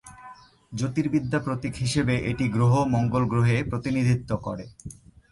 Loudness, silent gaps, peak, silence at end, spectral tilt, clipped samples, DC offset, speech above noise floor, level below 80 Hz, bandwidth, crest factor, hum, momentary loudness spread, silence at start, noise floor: -25 LUFS; none; -10 dBFS; 0.4 s; -7 dB/octave; under 0.1%; under 0.1%; 24 dB; -48 dBFS; 11.5 kHz; 14 dB; none; 16 LU; 0.05 s; -48 dBFS